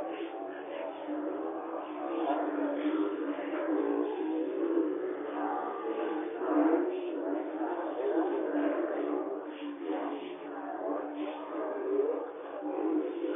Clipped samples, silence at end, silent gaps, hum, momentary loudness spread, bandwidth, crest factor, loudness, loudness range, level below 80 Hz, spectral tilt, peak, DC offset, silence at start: under 0.1%; 0 s; none; none; 8 LU; 3.7 kHz; 16 dB; -34 LUFS; 4 LU; -88 dBFS; 1 dB/octave; -16 dBFS; under 0.1%; 0 s